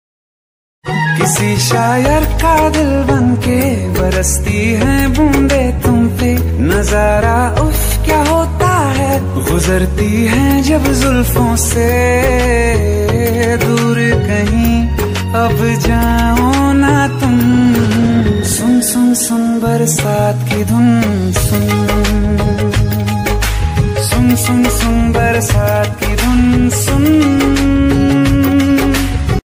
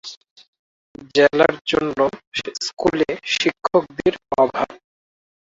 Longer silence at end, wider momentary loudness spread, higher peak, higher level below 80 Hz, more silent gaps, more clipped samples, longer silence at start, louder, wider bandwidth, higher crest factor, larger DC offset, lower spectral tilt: second, 0.05 s vs 0.7 s; second, 4 LU vs 10 LU; about the same, 0 dBFS vs 0 dBFS; first, -20 dBFS vs -54 dBFS; second, none vs 0.17-0.21 s, 0.31-0.36 s, 0.48-0.53 s, 0.59-0.95 s, 1.61-1.65 s, 2.27-2.32 s; neither; first, 0.85 s vs 0.05 s; first, -12 LUFS vs -20 LUFS; first, 16 kHz vs 7.8 kHz; second, 10 dB vs 20 dB; neither; first, -5.5 dB/octave vs -4 dB/octave